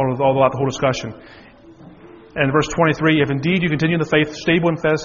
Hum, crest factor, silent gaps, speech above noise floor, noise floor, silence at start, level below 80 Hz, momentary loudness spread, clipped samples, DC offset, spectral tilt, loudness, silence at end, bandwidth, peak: none; 18 dB; none; 25 dB; -43 dBFS; 0 s; -46 dBFS; 5 LU; under 0.1%; under 0.1%; -5 dB/octave; -18 LUFS; 0 s; 7.2 kHz; 0 dBFS